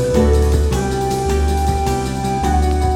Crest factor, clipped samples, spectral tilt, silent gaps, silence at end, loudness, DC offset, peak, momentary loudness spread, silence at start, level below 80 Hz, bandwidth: 14 dB; under 0.1%; -6.5 dB/octave; none; 0 s; -17 LUFS; under 0.1%; -2 dBFS; 5 LU; 0 s; -18 dBFS; 14.5 kHz